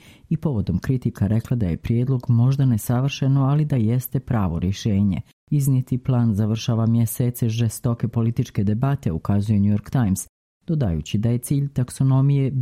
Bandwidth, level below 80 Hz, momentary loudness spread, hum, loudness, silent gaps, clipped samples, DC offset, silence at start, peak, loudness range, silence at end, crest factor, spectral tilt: 15.5 kHz; -44 dBFS; 5 LU; none; -22 LUFS; 5.33-5.47 s, 10.29-10.61 s; under 0.1%; under 0.1%; 0.3 s; -8 dBFS; 2 LU; 0 s; 14 dB; -7.5 dB/octave